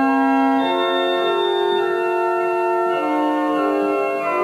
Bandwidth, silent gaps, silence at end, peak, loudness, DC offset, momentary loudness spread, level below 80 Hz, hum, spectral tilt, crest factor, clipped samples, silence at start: 13.5 kHz; none; 0 s; -6 dBFS; -19 LUFS; under 0.1%; 3 LU; -72 dBFS; none; -4.5 dB/octave; 12 dB; under 0.1%; 0 s